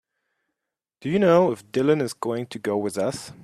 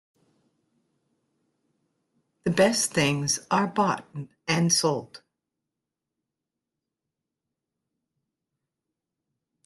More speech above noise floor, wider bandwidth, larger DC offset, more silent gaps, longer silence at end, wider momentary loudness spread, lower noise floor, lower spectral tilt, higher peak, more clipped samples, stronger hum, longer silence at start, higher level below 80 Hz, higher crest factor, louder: about the same, 63 dB vs 62 dB; about the same, 13.5 kHz vs 12.5 kHz; neither; neither; second, 0.1 s vs 4.5 s; about the same, 10 LU vs 12 LU; about the same, -85 dBFS vs -86 dBFS; first, -6 dB/octave vs -3.5 dB/octave; first, -4 dBFS vs -8 dBFS; neither; neither; second, 1 s vs 2.45 s; about the same, -64 dBFS vs -66 dBFS; about the same, 20 dB vs 22 dB; about the same, -23 LUFS vs -24 LUFS